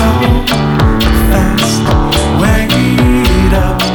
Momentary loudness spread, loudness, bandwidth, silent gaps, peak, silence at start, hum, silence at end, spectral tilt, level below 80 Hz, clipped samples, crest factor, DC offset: 2 LU; -10 LUFS; 19.5 kHz; none; 0 dBFS; 0 s; none; 0 s; -5.5 dB/octave; -14 dBFS; under 0.1%; 10 dB; under 0.1%